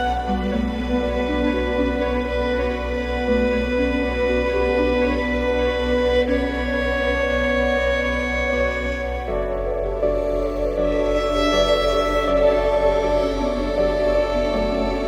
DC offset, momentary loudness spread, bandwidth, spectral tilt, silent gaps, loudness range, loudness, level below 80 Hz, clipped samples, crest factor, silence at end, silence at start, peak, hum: under 0.1%; 5 LU; 13.5 kHz; -6 dB/octave; none; 3 LU; -21 LUFS; -30 dBFS; under 0.1%; 14 dB; 0 s; 0 s; -6 dBFS; none